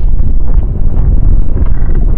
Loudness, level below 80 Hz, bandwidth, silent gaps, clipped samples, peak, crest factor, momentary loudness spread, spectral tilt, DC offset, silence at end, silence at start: -14 LUFS; -8 dBFS; 2 kHz; none; under 0.1%; 0 dBFS; 6 dB; 3 LU; -12 dB/octave; under 0.1%; 0 s; 0 s